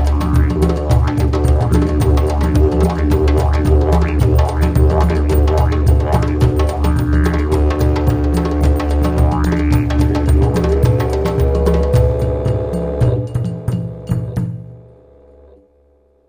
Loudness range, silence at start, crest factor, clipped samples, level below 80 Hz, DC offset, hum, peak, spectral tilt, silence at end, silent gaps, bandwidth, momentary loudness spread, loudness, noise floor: 4 LU; 0 s; 12 dB; under 0.1%; -18 dBFS; under 0.1%; none; 0 dBFS; -8 dB/octave; 1.45 s; none; 16 kHz; 6 LU; -15 LUFS; -53 dBFS